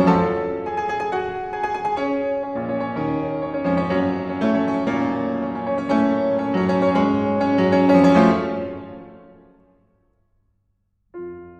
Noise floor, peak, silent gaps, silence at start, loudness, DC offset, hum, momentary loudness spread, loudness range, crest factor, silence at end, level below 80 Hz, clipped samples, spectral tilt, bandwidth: -68 dBFS; -2 dBFS; none; 0 s; -21 LUFS; under 0.1%; none; 11 LU; 6 LU; 18 dB; 0.05 s; -52 dBFS; under 0.1%; -8 dB/octave; 8.2 kHz